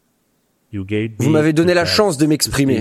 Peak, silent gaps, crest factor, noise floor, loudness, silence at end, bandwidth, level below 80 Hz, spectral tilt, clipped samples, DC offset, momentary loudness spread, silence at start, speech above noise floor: 0 dBFS; none; 16 dB; -64 dBFS; -15 LUFS; 0 s; 15 kHz; -44 dBFS; -5 dB/octave; under 0.1%; under 0.1%; 10 LU; 0.75 s; 48 dB